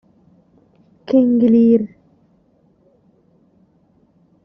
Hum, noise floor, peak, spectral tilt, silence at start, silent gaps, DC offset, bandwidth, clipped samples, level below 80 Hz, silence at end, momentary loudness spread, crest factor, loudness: none; -57 dBFS; -4 dBFS; -9 dB/octave; 1.1 s; none; under 0.1%; 5.4 kHz; under 0.1%; -62 dBFS; 2.6 s; 6 LU; 16 dB; -14 LUFS